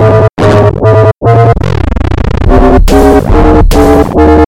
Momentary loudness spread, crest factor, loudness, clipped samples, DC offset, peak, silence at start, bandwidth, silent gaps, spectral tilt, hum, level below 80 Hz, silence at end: 6 LU; 4 dB; -6 LUFS; 0.9%; under 0.1%; 0 dBFS; 0 s; 17 kHz; none; -7.5 dB/octave; none; -10 dBFS; 0 s